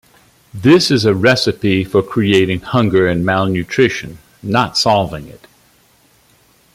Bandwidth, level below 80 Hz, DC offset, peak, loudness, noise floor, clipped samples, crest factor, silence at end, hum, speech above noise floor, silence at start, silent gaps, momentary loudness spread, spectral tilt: 15.5 kHz; -46 dBFS; under 0.1%; 0 dBFS; -14 LUFS; -52 dBFS; under 0.1%; 14 dB; 1.4 s; none; 39 dB; 0.55 s; none; 13 LU; -5.5 dB/octave